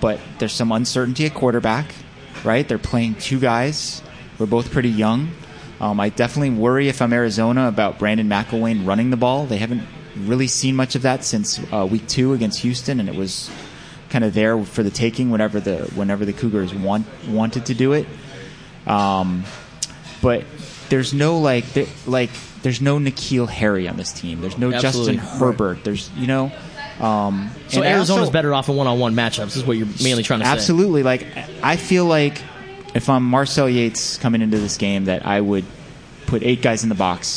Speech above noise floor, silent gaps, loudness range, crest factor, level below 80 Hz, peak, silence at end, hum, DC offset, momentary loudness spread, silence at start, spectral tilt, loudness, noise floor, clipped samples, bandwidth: 20 dB; none; 3 LU; 18 dB; -46 dBFS; -2 dBFS; 0 s; none; under 0.1%; 11 LU; 0 s; -5 dB/octave; -19 LUFS; -39 dBFS; under 0.1%; 10.5 kHz